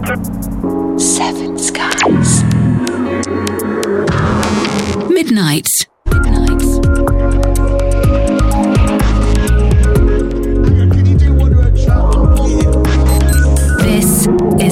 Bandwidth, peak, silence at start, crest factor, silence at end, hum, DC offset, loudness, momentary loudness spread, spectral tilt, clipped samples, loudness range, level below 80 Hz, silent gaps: 16.5 kHz; 0 dBFS; 0 s; 10 dB; 0 s; none; under 0.1%; -12 LUFS; 6 LU; -5.5 dB/octave; under 0.1%; 3 LU; -14 dBFS; none